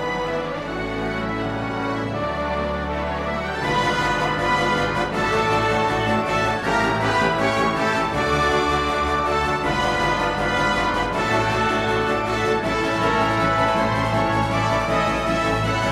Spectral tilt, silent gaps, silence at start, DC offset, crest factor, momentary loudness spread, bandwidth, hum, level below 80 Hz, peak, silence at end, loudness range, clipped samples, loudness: -5 dB/octave; none; 0 s; under 0.1%; 14 dB; 6 LU; 15.5 kHz; none; -38 dBFS; -8 dBFS; 0 s; 3 LU; under 0.1%; -21 LUFS